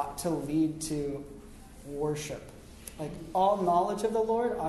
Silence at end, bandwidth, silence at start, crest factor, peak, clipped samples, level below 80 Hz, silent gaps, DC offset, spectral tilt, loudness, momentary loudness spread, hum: 0 s; 12.5 kHz; 0 s; 16 dB; -14 dBFS; under 0.1%; -52 dBFS; none; under 0.1%; -5.5 dB/octave; -30 LUFS; 21 LU; none